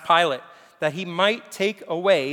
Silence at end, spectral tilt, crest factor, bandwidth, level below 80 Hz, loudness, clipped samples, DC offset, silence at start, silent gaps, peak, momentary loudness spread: 0 s; -4 dB/octave; 18 dB; 19 kHz; -78 dBFS; -23 LUFS; under 0.1%; under 0.1%; 0 s; none; -4 dBFS; 8 LU